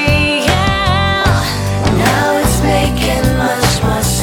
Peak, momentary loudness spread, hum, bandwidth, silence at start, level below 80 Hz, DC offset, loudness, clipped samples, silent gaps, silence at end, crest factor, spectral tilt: 0 dBFS; 2 LU; none; 19 kHz; 0 s; -22 dBFS; under 0.1%; -13 LUFS; under 0.1%; none; 0 s; 12 dB; -4.5 dB/octave